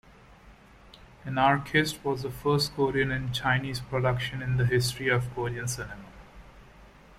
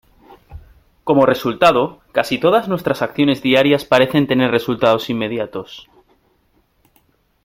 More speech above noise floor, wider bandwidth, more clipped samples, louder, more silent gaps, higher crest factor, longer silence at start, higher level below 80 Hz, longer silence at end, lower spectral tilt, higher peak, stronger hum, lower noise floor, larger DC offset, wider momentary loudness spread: second, 26 dB vs 44 dB; about the same, 15.5 kHz vs 16.5 kHz; neither; second, -27 LUFS vs -16 LUFS; neither; about the same, 20 dB vs 18 dB; second, 0.3 s vs 0.5 s; about the same, -50 dBFS vs -50 dBFS; second, 0.3 s vs 1.65 s; about the same, -5 dB/octave vs -6 dB/octave; second, -10 dBFS vs 0 dBFS; neither; second, -53 dBFS vs -60 dBFS; neither; about the same, 9 LU vs 9 LU